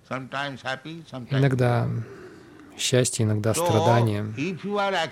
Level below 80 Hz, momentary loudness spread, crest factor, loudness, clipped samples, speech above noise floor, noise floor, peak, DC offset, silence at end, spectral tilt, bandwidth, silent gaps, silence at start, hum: -60 dBFS; 15 LU; 18 dB; -24 LUFS; under 0.1%; 23 dB; -46 dBFS; -6 dBFS; under 0.1%; 0 s; -5 dB/octave; 15.5 kHz; none; 0.1 s; none